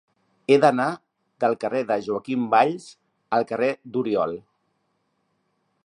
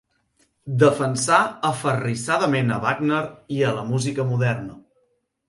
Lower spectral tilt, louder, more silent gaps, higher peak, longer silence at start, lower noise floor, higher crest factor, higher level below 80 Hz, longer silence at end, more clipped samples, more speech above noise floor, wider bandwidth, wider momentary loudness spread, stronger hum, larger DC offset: about the same, -6 dB/octave vs -5.5 dB/octave; about the same, -23 LUFS vs -22 LUFS; neither; about the same, -4 dBFS vs -2 dBFS; second, 0.5 s vs 0.65 s; first, -72 dBFS vs -68 dBFS; about the same, 22 dB vs 20 dB; second, -70 dBFS vs -60 dBFS; first, 1.45 s vs 0.7 s; neither; about the same, 50 dB vs 47 dB; about the same, 10.5 kHz vs 11.5 kHz; about the same, 12 LU vs 10 LU; neither; neither